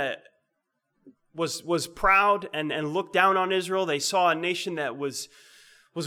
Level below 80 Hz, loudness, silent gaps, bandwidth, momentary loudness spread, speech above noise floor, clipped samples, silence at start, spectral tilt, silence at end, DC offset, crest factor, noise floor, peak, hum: -52 dBFS; -25 LUFS; none; 17.5 kHz; 14 LU; 54 dB; under 0.1%; 0 s; -3.5 dB/octave; 0 s; under 0.1%; 22 dB; -79 dBFS; -6 dBFS; none